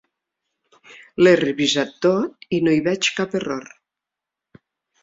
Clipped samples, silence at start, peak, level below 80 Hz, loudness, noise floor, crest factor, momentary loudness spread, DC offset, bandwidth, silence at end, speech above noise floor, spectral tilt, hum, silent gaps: under 0.1%; 1.2 s; -2 dBFS; -62 dBFS; -19 LUFS; -86 dBFS; 20 dB; 11 LU; under 0.1%; 7.8 kHz; 1.4 s; 67 dB; -4.5 dB/octave; none; none